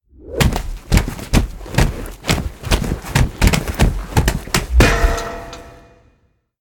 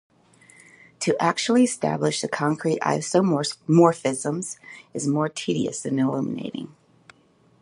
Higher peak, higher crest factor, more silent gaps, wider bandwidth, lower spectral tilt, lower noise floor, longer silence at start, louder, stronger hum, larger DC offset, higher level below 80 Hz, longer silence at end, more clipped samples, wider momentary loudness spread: about the same, 0 dBFS vs -2 dBFS; about the same, 18 dB vs 22 dB; neither; first, 18.5 kHz vs 11.5 kHz; about the same, -5 dB/octave vs -5 dB/octave; about the same, -60 dBFS vs -59 dBFS; second, 0.25 s vs 1 s; first, -18 LUFS vs -23 LUFS; neither; neither; first, -20 dBFS vs -68 dBFS; about the same, 0.85 s vs 0.95 s; neither; about the same, 12 LU vs 12 LU